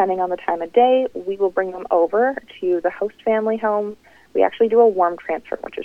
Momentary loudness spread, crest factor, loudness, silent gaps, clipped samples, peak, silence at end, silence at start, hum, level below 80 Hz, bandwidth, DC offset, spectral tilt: 11 LU; 16 dB; -19 LUFS; none; under 0.1%; -2 dBFS; 0 s; 0 s; none; -60 dBFS; 5.2 kHz; under 0.1%; -7 dB/octave